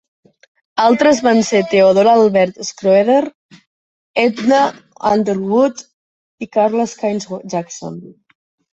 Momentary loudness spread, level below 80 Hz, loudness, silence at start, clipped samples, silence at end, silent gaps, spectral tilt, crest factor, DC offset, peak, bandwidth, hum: 15 LU; -58 dBFS; -14 LUFS; 0.75 s; under 0.1%; 0.7 s; 3.35-3.49 s, 3.67-4.14 s, 5.93-6.38 s; -5 dB/octave; 16 dB; under 0.1%; 0 dBFS; 8.2 kHz; none